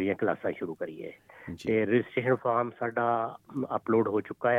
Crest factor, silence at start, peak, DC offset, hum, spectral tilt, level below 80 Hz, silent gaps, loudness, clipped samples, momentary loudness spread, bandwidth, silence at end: 16 dB; 0 s; -12 dBFS; under 0.1%; none; -8 dB/octave; -70 dBFS; none; -29 LUFS; under 0.1%; 12 LU; 10.5 kHz; 0 s